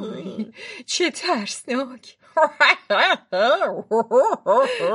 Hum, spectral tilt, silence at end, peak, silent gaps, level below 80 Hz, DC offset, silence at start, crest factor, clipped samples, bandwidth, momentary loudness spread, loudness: none; -2.5 dB/octave; 0 s; -2 dBFS; none; -78 dBFS; under 0.1%; 0 s; 18 dB; under 0.1%; 11.5 kHz; 16 LU; -20 LUFS